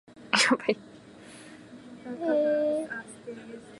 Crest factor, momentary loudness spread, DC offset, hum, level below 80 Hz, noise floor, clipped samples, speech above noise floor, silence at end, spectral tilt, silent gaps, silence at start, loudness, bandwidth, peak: 24 dB; 24 LU; under 0.1%; none; -72 dBFS; -49 dBFS; under 0.1%; 20 dB; 0 s; -2.5 dB/octave; none; 0.15 s; -27 LUFS; 11.5 kHz; -6 dBFS